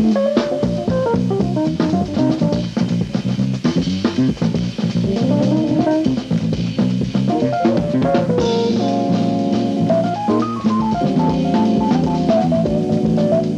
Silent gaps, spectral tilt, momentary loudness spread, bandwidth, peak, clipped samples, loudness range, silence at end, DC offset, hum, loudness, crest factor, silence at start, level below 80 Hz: none; -7.5 dB/octave; 4 LU; 9.2 kHz; -4 dBFS; under 0.1%; 2 LU; 0 s; under 0.1%; none; -17 LUFS; 14 dB; 0 s; -42 dBFS